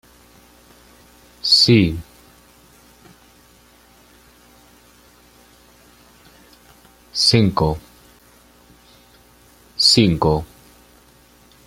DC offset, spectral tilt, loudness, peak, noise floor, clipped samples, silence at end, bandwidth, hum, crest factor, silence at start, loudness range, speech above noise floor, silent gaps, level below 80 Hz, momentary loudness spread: under 0.1%; -4.5 dB/octave; -15 LUFS; 0 dBFS; -51 dBFS; under 0.1%; 1.2 s; 16.5 kHz; 60 Hz at -55 dBFS; 22 dB; 1.45 s; 3 LU; 35 dB; none; -44 dBFS; 20 LU